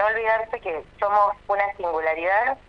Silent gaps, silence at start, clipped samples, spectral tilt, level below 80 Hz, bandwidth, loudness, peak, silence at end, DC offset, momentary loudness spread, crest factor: none; 0 s; under 0.1%; -5.5 dB/octave; -54 dBFS; 6.4 kHz; -23 LUFS; -8 dBFS; 0.1 s; under 0.1%; 8 LU; 16 dB